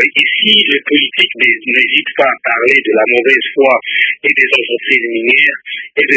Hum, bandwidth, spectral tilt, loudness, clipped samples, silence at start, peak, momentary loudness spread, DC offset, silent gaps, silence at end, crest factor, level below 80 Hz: none; 8 kHz; -3.5 dB/octave; -10 LUFS; 0.2%; 0 s; 0 dBFS; 4 LU; under 0.1%; none; 0 s; 12 dB; -62 dBFS